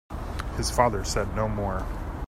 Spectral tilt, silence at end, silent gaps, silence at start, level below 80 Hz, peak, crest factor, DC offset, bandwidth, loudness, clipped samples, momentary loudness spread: -5 dB/octave; 0 s; none; 0.1 s; -34 dBFS; -4 dBFS; 22 dB; under 0.1%; 16 kHz; -28 LUFS; under 0.1%; 11 LU